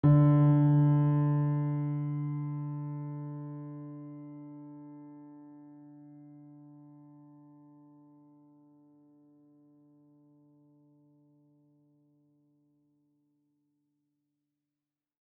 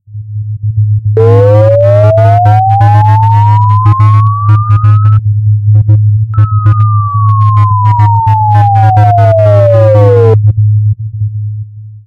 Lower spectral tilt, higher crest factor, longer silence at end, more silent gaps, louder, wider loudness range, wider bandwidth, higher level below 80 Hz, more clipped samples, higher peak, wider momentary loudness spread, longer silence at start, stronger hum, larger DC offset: first, -11.5 dB/octave vs -10 dB/octave; first, 20 dB vs 6 dB; first, 9.7 s vs 0.05 s; neither; second, -28 LUFS vs -7 LUFS; first, 27 LU vs 2 LU; second, 3.2 kHz vs 3.6 kHz; second, -66 dBFS vs -34 dBFS; second, under 0.1% vs 5%; second, -14 dBFS vs 0 dBFS; first, 29 LU vs 10 LU; about the same, 0.05 s vs 0.1 s; neither; neither